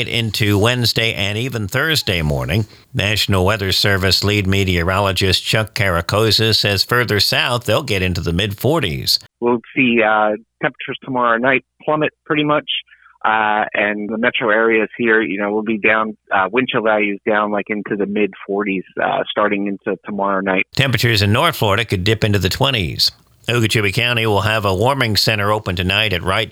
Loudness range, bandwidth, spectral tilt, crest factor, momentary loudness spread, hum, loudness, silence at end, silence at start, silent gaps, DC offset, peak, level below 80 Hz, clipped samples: 3 LU; 19 kHz; -4.5 dB/octave; 14 dB; 6 LU; none; -16 LUFS; 0 s; 0 s; none; under 0.1%; -2 dBFS; -42 dBFS; under 0.1%